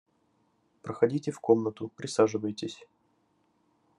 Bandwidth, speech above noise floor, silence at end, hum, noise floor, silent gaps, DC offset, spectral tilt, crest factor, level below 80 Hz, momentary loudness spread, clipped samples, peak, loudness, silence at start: 11 kHz; 43 dB; 1.15 s; none; -71 dBFS; none; under 0.1%; -6 dB/octave; 24 dB; -80 dBFS; 15 LU; under 0.1%; -8 dBFS; -29 LUFS; 0.85 s